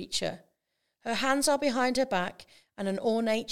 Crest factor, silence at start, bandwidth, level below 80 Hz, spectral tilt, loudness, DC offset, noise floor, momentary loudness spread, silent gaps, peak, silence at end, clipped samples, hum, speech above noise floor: 18 dB; 0 s; 17.5 kHz; -62 dBFS; -3 dB/octave; -29 LUFS; under 0.1%; -80 dBFS; 11 LU; none; -12 dBFS; 0 s; under 0.1%; none; 51 dB